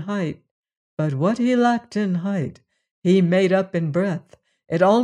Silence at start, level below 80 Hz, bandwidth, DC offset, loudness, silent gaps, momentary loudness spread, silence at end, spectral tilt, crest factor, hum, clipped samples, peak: 0 s; -64 dBFS; 10 kHz; under 0.1%; -21 LUFS; 0.51-0.63 s, 0.77-0.97 s, 2.91-3.02 s; 12 LU; 0 s; -7.5 dB/octave; 16 dB; none; under 0.1%; -4 dBFS